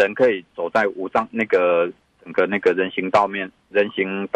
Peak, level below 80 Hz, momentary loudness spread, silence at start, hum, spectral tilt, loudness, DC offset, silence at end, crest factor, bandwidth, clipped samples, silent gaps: -6 dBFS; -64 dBFS; 7 LU; 0 s; none; -6 dB/octave; -21 LUFS; under 0.1%; 0.1 s; 14 dB; 8.4 kHz; under 0.1%; none